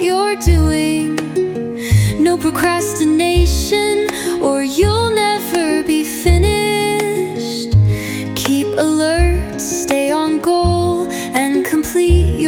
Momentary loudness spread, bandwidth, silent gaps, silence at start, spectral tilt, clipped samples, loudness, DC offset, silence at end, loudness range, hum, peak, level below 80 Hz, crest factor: 6 LU; 17.5 kHz; none; 0 s; -5.5 dB/octave; under 0.1%; -15 LUFS; under 0.1%; 0 s; 1 LU; none; -2 dBFS; -24 dBFS; 14 dB